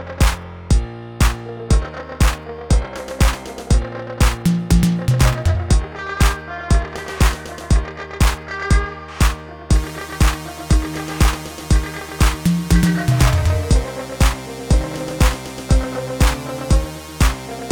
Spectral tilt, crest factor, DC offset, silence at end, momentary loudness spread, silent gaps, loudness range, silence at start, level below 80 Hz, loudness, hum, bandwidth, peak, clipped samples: -5 dB/octave; 16 dB; under 0.1%; 0 s; 12 LU; none; 2 LU; 0 s; -20 dBFS; -19 LUFS; none; 19.5 kHz; 0 dBFS; under 0.1%